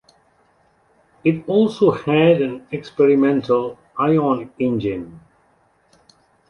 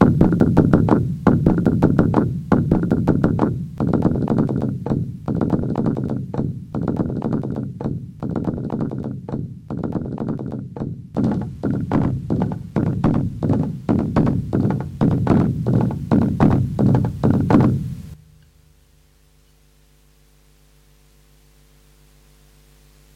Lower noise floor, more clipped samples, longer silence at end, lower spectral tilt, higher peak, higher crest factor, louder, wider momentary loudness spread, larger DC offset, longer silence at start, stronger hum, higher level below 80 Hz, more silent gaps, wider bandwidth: first, -59 dBFS vs -54 dBFS; neither; second, 1.3 s vs 5 s; second, -8.5 dB/octave vs -10 dB/octave; second, -4 dBFS vs 0 dBFS; about the same, 16 dB vs 20 dB; about the same, -18 LUFS vs -20 LUFS; about the same, 13 LU vs 11 LU; neither; first, 1.25 s vs 0 s; second, none vs 50 Hz at -40 dBFS; second, -56 dBFS vs -38 dBFS; neither; second, 6.8 kHz vs 9 kHz